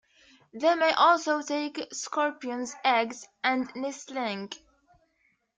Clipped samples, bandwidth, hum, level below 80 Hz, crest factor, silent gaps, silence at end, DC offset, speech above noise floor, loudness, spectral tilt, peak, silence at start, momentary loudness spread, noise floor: under 0.1%; 9.4 kHz; none; -76 dBFS; 20 dB; none; 1 s; under 0.1%; 44 dB; -27 LUFS; -2.5 dB/octave; -10 dBFS; 0.55 s; 14 LU; -72 dBFS